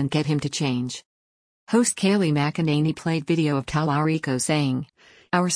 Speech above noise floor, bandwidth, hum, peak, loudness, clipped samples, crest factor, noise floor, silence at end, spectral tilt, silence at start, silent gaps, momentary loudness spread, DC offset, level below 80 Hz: over 67 dB; 10.5 kHz; none; -8 dBFS; -23 LUFS; under 0.1%; 16 dB; under -90 dBFS; 0 s; -5 dB/octave; 0 s; 1.06-1.67 s; 7 LU; under 0.1%; -56 dBFS